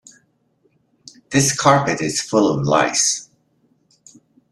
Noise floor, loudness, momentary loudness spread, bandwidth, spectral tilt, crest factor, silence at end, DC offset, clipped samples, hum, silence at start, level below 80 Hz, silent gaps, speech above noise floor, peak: -63 dBFS; -17 LUFS; 6 LU; 14 kHz; -3.5 dB/octave; 20 dB; 1.3 s; under 0.1%; under 0.1%; none; 1.3 s; -56 dBFS; none; 46 dB; -2 dBFS